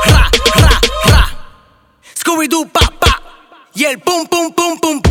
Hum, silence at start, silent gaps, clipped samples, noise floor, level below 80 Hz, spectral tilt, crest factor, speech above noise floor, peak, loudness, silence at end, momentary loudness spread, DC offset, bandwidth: none; 0 s; none; under 0.1%; -48 dBFS; -18 dBFS; -4 dB/octave; 12 dB; 35 dB; 0 dBFS; -12 LUFS; 0 s; 10 LU; under 0.1%; 19.5 kHz